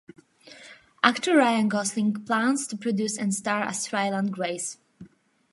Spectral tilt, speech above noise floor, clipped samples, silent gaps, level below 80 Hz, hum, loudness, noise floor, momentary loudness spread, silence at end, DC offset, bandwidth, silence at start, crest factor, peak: -4 dB/octave; 28 dB; under 0.1%; none; -76 dBFS; none; -25 LUFS; -53 dBFS; 11 LU; 0.45 s; under 0.1%; 11.5 kHz; 0.45 s; 24 dB; -2 dBFS